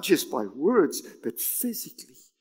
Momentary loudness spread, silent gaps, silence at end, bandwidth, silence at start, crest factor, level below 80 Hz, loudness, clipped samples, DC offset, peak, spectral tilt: 13 LU; none; 0.35 s; 16.5 kHz; 0 s; 20 dB; -86 dBFS; -26 LUFS; under 0.1%; under 0.1%; -8 dBFS; -3.5 dB/octave